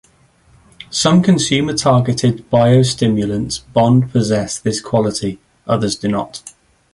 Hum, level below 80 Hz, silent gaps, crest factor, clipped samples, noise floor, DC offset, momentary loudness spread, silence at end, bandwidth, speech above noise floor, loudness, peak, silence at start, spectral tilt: none; -46 dBFS; none; 14 dB; under 0.1%; -52 dBFS; under 0.1%; 10 LU; 0.45 s; 11.5 kHz; 38 dB; -15 LUFS; -2 dBFS; 0.9 s; -5.5 dB/octave